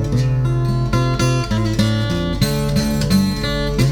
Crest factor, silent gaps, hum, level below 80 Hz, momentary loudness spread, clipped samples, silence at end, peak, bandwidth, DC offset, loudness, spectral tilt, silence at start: 14 dB; none; none; -28 dBFS; 3 LU; under 0.1%; 0 s; -2 dBFS; 18.5 kHz; under 0.1%; -18 LUFS; -6 dB/octave; 0 s